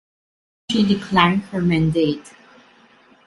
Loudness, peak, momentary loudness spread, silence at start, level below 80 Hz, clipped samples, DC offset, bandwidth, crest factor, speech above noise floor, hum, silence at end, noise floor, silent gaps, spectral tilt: -19 LUFS; 0 dBFS; 7 LU; 0.7 s; -48 dBFS; under 0.1%; under 0.1%; 11.5 kHz; 20 dB; 34 dB; none; 1 s; -52 dBFS; none; -6.5 dB/octave